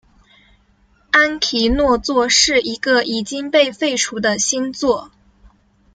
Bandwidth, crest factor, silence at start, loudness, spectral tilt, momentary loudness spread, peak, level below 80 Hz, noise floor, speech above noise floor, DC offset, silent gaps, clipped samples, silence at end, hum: 10 kHz; 18 dB; 1.15 s; -16 LUFS; -1.5 dB/octave; 7 LU; 0 dBFS; -38 dBFS; -56 dBFS; 39 dB; under 0.1%; none; under 0.1%; 0.9 s; none